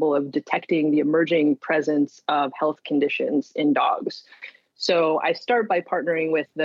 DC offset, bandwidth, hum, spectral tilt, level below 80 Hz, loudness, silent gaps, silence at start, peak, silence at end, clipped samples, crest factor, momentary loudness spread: under 0.1%; 7.6 kHz; none; -5.5 dB/octave; -78 dBFS; -22 LUFS; none; 0 s; -6 dBFS; 0 s; under 0.1%; 16 dB; 8 LU